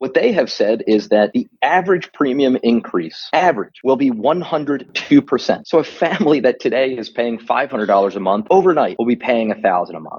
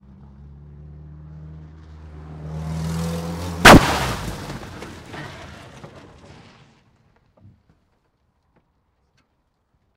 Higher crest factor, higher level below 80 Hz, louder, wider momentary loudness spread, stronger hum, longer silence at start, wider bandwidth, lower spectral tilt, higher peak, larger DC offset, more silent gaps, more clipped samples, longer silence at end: second, 16 dB vs 22 dB; second, -64 dBFS vs -36 dBFS; about the same, -16 LUFS vs -16 LUFS; second, 6 LU vs 31 LU; neither; second, 0 s vs 0.8 s; second, 7 kHz vs 16 kHz; first, -6 dB/octave vs -4.5 dB/octave; about the same, 0 dBFS vs 0 dBFS; neither; neither; neither; second, 0 s vs 4.1 s